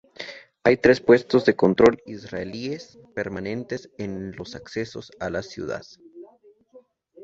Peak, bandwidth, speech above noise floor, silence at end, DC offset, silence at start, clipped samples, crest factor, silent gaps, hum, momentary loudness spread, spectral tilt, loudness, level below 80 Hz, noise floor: -2 dBFS; 7.8 kHz; 32 dB; 0 s; under 0.1%; 0.2 s; under 0.1%; 22 dB; none; none; 18 LU; -6.5 dB/octave; -23 LUFS; -54 dBFS; -55 dBFS